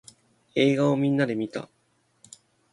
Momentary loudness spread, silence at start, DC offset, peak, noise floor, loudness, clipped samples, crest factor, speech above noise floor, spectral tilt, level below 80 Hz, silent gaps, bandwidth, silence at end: 15 LU; 0.55 s; under 0.1%; -8 dBFS; -68 dBFS; -24 LUFS; under 0.1%; 18 dB; 45 dB; -6.5 dB/octave; -70 dBFS; none; 11.5 kHz; 1.1 s